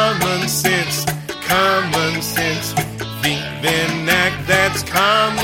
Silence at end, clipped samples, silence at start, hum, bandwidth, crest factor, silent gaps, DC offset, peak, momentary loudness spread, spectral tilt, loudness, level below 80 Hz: 0 s; under 0.1%; 0 s; none; 17 kHz; 16 dB; none; under 0.1%; 0 dBFS; 6 LU; -3 dB/octave; -17 LUFS; -44 dBFS